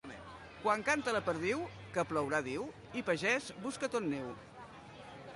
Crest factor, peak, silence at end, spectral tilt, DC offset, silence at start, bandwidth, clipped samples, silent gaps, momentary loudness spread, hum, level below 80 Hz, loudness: 20 dB; -18 dBFS; 0 s; -4.5 dB/octave; under 0.1%; 0.05 s; 11.5 kHz; under 0.1%; none; 19 LU; none; -66 dBFS; -36 LUFS